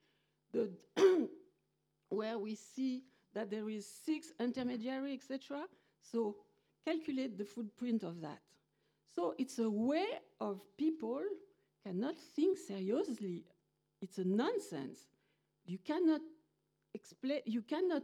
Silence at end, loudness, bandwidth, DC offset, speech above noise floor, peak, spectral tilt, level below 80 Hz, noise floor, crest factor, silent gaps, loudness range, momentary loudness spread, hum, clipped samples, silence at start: 0 s; -39 LUFS; 13.5 kHz; under 0.1%; 43 dB; -18 dBFS; -6 dB/octave; -88 dBFS; -82 dBFS; 22 dB; none; 4 LU; 14 LU; none; under 0.1%; 0.55 s